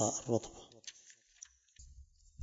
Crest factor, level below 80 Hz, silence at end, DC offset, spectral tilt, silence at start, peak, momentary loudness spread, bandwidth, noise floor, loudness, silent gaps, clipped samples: 24 dB; -64 dBFS; 0 s; under 0.1%; -4.5 dB/octave; 0 s; -18 dBFS; 24 LU; 8 kHz; -63 dBFS; -39 LUFS; none; under 0.1%